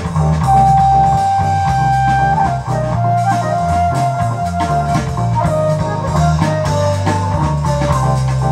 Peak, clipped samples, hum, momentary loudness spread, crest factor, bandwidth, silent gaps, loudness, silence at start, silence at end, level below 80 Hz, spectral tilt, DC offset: 0 dBFS; under 0.1%; none; 6 LU; 12 dB; 12.5 kHz; none; -14 LUFS; 0 s; 0 s; -28 dBFS; -7 dB/octave; under 0.1%